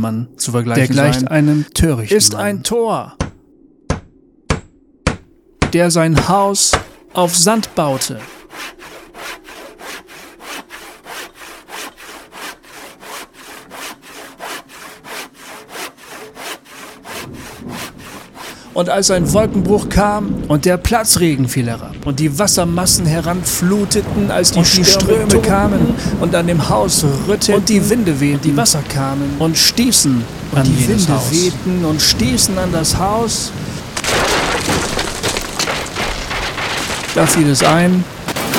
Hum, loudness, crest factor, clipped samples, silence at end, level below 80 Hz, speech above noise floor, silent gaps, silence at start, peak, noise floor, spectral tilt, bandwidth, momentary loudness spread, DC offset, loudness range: none; -14 LUFS; 16 dB; under 0.1%; 0 s; -34 dBFS; 34 dB; none; 0 s; 0 dBFS; -48 dBFS; -4 dB/octave; 18 kHz; 20 LU; under 0.1%; 18 LU